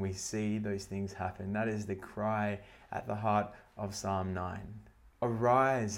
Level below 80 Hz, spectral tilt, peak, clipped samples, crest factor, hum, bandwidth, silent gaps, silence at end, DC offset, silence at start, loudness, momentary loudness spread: -62 dBFS; -6 dB/octave; -16 dBFS; under 0.1%; 20 dB; none; 16.5 kHz; none; 0 s; under 0.1%; 0 s; -35 LUFS; 15 LU